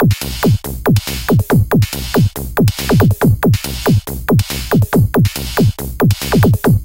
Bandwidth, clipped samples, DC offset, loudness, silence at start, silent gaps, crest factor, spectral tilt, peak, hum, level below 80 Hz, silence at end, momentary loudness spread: 17.5 kHz; under 0.1%; under 0.1%; -14 LUFS; 0 s; none; 12 dB; -6.5 dB/octave; 0 dBFS; none; -26 dBFS; 0 s; 4 LU